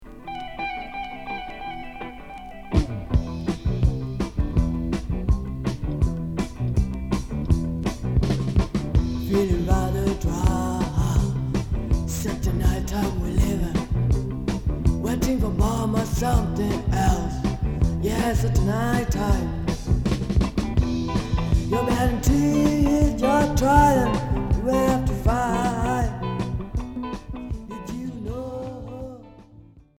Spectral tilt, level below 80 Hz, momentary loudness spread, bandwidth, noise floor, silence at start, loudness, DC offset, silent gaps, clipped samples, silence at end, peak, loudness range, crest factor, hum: -6.5 dB/octave; -28 dBFS; 12 LU; 17.5 kHz; -49 dBFS; 0 s; -24 LUFS; under 0.1%; none; under 0.1%; 0.2 s; -4 dBFS; 8 LU; 20 dB; none